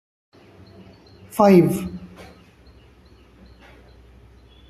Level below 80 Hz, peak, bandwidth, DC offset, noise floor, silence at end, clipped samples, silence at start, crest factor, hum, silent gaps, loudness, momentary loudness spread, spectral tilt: -52 dBFS; -2 dBFS; 14 kHz; under 0.1%; -50 dBFS; 2.65 s; under 0.1%; 1.35 s; 22 dB; none; none; -18 LUFS; 25 LU; -7.5 dB/octave